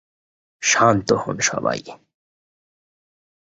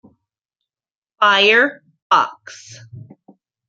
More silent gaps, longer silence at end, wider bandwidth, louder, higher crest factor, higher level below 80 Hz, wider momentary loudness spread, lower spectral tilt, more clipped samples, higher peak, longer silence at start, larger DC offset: second, none vs 2.02-2.10 s; first, 1.55 s vs 0.65 s; about the same, 8 kHz vs 7.8 kHz; second, -19 LUFS vs -14 LUFS; about the same, 20 dB vs 18 dB; first, -56 dBFS vs -74 dBFS; second, 9 LU vs 26 LU; about the same, -3 dB/octave vs -2.5 dB/octave; neither; about the same, -2 dBFS vs -2 dBFS; second, 0.6 s vs 1.2 s; neither